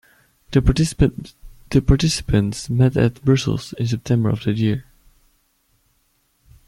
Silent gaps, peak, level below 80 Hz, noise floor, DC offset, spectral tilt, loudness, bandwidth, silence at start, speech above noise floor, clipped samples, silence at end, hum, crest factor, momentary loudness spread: none; -2 dBFS; -32 dBFS; -64 dBFS; under 0.1%; -6.5 dB/octave; -19 LUFS; 13 kHz; 0.5 s; 46 dB; under 0.1%; 1.85 s; none; 18 dB; 7 LU